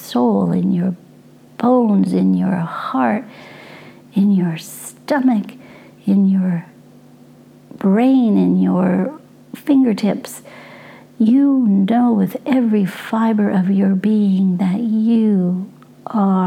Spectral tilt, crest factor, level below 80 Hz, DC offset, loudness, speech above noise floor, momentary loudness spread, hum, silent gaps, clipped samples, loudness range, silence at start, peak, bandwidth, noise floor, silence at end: -8 dB/octave; 14 dB; -66 dBFS; under 0.1%; -16 LUFS; 29 dB; 14 LU; none; none; under 0.1%; 4 LU; 0 s; -2 dBFS; 15 kHz; -44 dBFS; 0 s